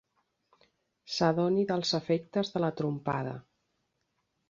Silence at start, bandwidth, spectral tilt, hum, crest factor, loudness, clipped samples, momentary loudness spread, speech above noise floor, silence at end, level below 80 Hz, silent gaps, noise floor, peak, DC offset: 1.05 s; 7.6 kHz; -6 dB/octave; none; 20 dB; -30 LUFS; under 0.1%; 9 LU; 50 dB; 1.1 s; -70 dBFS; none; -79 dBFS; -12 dBFS; under 0.1%